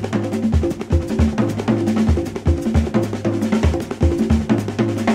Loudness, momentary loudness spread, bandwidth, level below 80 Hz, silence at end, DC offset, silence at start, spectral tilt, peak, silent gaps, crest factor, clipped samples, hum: -19 LUFS; 3 LU; 13.5 kHz; -26 dBFS; 0 s; under 0.1%; 0 s; -7.5 dB/octave; -4 dBFS; none; 14 dB; under 0.1%; none